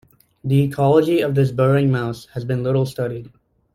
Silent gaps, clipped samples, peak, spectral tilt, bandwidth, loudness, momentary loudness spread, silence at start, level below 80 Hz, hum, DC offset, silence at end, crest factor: none; under 0.1%; -4 dBFS; -8 dB/octave; 15 kHz; -19 LUFS; 11 LU; 0.45 s; -52 dBFS; none; under 0.1%; 0.45 s; 16 dB